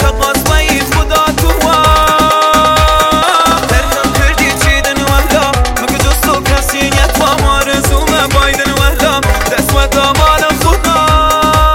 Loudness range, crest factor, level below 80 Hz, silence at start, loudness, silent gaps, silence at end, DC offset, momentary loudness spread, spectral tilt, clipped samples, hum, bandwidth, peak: 2 LU; 10 dB; -16 dBFS; 0 s; -9 LUFS; none; 0 s; 0.3%; 4 LU; -3.5 dB/octave; 0.7%; none; 17 kHz; 0 dBFS